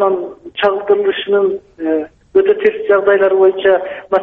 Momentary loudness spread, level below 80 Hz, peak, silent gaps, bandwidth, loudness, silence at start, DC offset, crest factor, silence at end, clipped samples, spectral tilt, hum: 8 LU; -54 dBFS; -2 dBFS; none; 4.1 kHz; -14 LUFS; 0 s; under 0.1%; 12 dB; 0 s; under 0.1%; -7 dB/octave; none